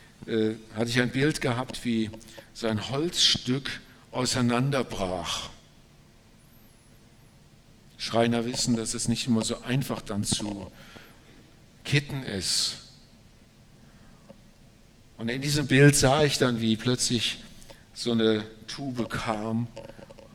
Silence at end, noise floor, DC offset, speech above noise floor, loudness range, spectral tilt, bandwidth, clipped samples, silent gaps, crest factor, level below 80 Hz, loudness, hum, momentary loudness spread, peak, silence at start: 0.1 s; -55 dBFS; under 0.1%; 29 dB; 9 LU; -4 dB/octave; 17 kHz; under 0.1%; none; 22 dB; -50 dBFS; -26 LUFS; none; 17 LU; -6 dBFS; 0.2 s